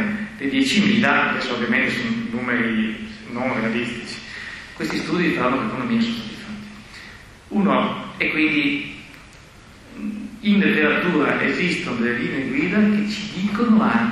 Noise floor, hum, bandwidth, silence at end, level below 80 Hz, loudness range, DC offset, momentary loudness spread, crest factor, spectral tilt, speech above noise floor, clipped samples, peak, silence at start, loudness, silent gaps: -44 dBFS; none; 12 kHz; 0 s; -50 dBFS; 5 LU; under 0.1%; 16 LU; 18 dB; -5.5 dB/octave; 24 dB; under 0.1%; -4 dBFS; 0 s; -20 LUFS; none